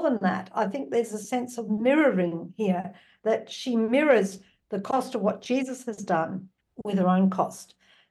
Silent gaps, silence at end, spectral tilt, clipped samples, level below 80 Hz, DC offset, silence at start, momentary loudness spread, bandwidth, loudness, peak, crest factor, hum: none; 0.45 s; -6.5 dB/octave; under 0.1%; -74 dBFS; under 0.1%; 0 s; 13 LU; 12.5 kHz; -26 LUFS; -8 dBFS; 18 dB; none